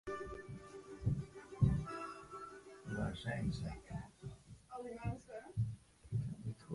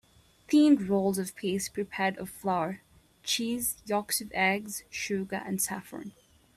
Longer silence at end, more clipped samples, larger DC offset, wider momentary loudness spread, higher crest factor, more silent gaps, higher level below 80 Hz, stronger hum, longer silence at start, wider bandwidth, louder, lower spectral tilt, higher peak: second, 0 s vs 0.45 s; neither; neither; about the same, 16 LU vs 14 LU; first, 24 dB vs 18 dB; neither; first, -54 dBFS vs -64 dBFS; neither; second, 0.05 s vs 0.5 s; second, 11.5 kHz vs 15.5 kHz; second, -43 LUFS vs -29 LUFS; first, -7.5 dB/octave vs -4 dB/octave; second, -18 dBFS vs -12 dBFS